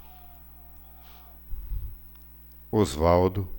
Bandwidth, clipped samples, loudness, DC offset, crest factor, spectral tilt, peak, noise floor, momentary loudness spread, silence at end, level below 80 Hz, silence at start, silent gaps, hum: over 20 kHz; under 0.1%; -26 LUFS; under 0.1%; 20 dB; -7 dB/octave; -8 dBFS; -48 dBFS; 25 LU; 0 s; -40 dBFS; 0 s; none; none